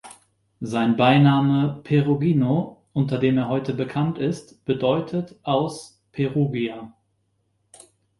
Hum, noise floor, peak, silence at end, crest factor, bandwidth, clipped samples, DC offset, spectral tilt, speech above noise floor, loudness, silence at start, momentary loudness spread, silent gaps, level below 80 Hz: none; -70 dBFS; -4 dBFS; 1.3 s; 18 dB; 11.5 kHz; under 0.1%; under 0.1%; -7.5 dB/octave; 49 dB; -22 LUFS; 0.05 s; 12 LU; none; -58 dBFS